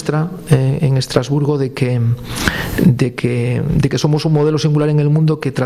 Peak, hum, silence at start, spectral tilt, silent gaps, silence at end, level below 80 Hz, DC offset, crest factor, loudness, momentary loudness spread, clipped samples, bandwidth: 0 dBFS; none; 0 s; -7 dB/octave; none; 0 s; -36 dBFS; under 0.1%; 14 dB; -15 LUFS; 4 LU; under 0.1%; 15 kHz